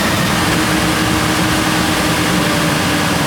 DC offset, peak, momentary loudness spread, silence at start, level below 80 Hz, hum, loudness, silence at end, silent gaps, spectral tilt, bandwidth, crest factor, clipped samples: under 0.1%; -2 dBFS; 0 LU; 0 s; -32 dBFS; none; -14 LUFS; 0 s; none; -4 dB/octave; over 20 kHz; 14 dB; under 0.1%